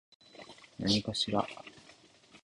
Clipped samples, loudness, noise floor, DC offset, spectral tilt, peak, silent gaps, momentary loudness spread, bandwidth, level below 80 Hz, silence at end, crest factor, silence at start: under 0.1%; -32 LUFS; -60 dBFS; under 0.1%; -4.5 dB/octave; -14 dBFS; none; 22 LU; 11.5 kHz; -62 dBFS; 0.05 s; 22 dB; 0.35 s